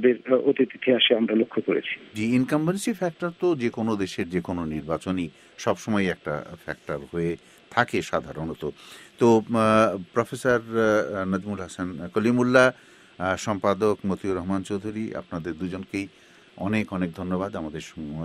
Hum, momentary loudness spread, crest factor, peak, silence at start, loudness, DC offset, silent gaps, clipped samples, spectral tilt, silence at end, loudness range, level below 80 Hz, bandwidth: none; 14 LU; 22 dB; -4 dBFS; 0 s; -25 LUFS; under 0.1%; none; under 0.1%; -5.5 dB/octave; 0 s; 6 LU; -56 dBFS; 14 kHz